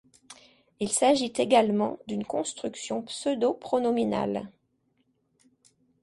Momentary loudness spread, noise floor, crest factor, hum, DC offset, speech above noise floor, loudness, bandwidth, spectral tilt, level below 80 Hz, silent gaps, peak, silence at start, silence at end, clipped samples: 12 LU; -72 dBFS; 20 dB; none; under 0.1%; 46 dB; -27 LUFS; 11.5 kHz; -4 dB/octave; -66 dBFS; none; -8 dBFS; 0.3 s; 1.55 s; under 0.1%